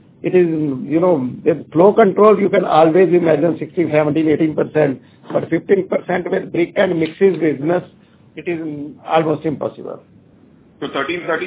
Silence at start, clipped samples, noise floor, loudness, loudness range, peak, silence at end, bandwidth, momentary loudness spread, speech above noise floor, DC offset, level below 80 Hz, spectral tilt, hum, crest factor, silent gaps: 0.25 s; under 0.1%; -48 dBFS; -16 LUFS; 9 LU; 0 dBFS; 0 s; 4 kHz; 14 LU; 32 dB; under 0.1%; -58 dBFS; -11 dB/octave; none; 16 dB; none